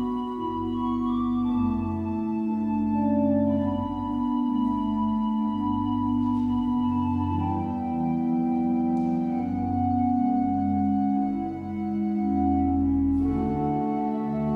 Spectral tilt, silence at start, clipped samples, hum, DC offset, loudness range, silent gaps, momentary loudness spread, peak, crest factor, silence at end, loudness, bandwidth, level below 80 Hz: -10 dB/octave; 0 s; under 0.1%; none; under 0.1%; 1 LU; none; 5 LU; -14 dBFS; 12 dB; 0 s; -26 LUFS; 4.7 kHz; -44 dBFS